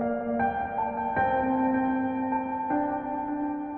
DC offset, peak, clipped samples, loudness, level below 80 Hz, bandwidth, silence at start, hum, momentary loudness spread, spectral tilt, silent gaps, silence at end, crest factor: under 0.1%; -14 dBFS; under 0.1%; -28 LUFS; -54 dBFS; 3.4 kHz; 0 s; none; 5 LU; -6 dB/octave; none; 0 s; 12 dB